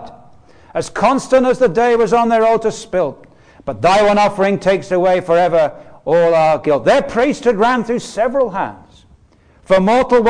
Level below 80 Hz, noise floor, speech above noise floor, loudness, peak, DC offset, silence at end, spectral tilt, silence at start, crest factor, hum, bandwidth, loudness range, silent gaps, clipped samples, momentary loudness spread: -44 dBFS; -49 dBFS; 36 dB; -14 LUFS; -4 dBFS; 0.4%; 0 s; -5.5 dB/octave; 0 s; 12 dB; none; 10 kHz; 2 LU; none; under 0.1%; 10 LU